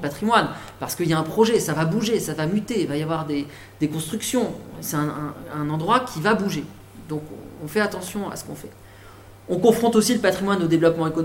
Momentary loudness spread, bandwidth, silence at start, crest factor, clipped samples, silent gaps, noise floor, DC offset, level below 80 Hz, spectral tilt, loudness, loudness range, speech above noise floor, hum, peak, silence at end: 14 LU; 17 kHz; 0 s; 20 dB; under 0.1%; none; -44 dBFS; under 0.1%; -52 dBFS; -5 dB/octave; -23 LUFS; 4 LU; 22 dB; none; -2 dBFS; 0 s